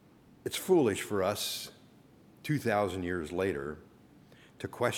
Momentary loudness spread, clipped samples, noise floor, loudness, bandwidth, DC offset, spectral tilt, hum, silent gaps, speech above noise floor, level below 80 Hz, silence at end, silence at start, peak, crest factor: 17 LU; under 0.1%; -59 dBFS; -32 LUFS; 19.5 kHz; under 0.1%; -4.5 dB/octave; none; none; 28 dB; -64 dBFS; 0 s; 0.45 s; -14 dBFS; 20 dB